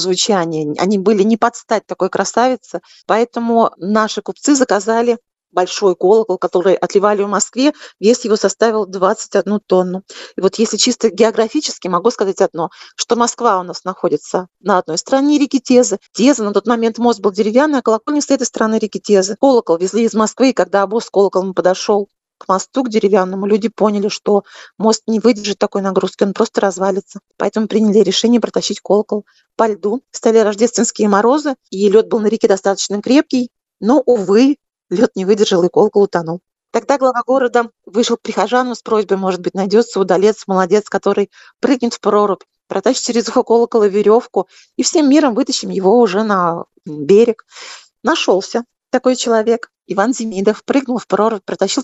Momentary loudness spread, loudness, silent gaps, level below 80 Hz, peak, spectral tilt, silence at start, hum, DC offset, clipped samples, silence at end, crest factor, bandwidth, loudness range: 8 LU; -15 LUFS; none; -64 dBFS; 0 dBFS; -4.5 dB/octave; 0 s; none; under 0.1%; under 0.1%; 0 s; 14 dB; 8.4 kHz; 2 LU